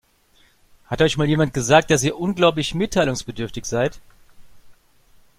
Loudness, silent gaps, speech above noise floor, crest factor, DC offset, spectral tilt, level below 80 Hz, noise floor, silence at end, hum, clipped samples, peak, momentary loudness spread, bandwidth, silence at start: -20 LUFS; none; 38 dB; 22 dB; under 0.1%; -4.5 dB/octave; -44 dBFS; -57 dBFS; 0.65 s; none; under 0.1%; 0 dBFS; 11 LU; 15.5 kHz; 0.9 s